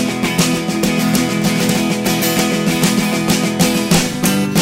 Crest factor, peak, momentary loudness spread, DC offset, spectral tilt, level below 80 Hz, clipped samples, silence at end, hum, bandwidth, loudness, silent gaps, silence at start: 14 dB; 0 dBFS; 2 LU; under 0.1%; -4 dB/octave; -40 dBFS; under 0.1%; 0 s; none; 16.5 kHz; -15 LUFS; none; 0 s